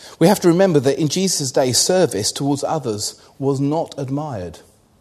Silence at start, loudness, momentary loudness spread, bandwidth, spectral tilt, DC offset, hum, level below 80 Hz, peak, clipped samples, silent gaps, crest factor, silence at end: 0 s; -18 LUFS; 11 LU; 13.5 kHz; -4.5 dB/octave; under 0.1%; none; -56 dBFS; 0 dBFS; under 0.1%; none; 18 dB; 0.4 s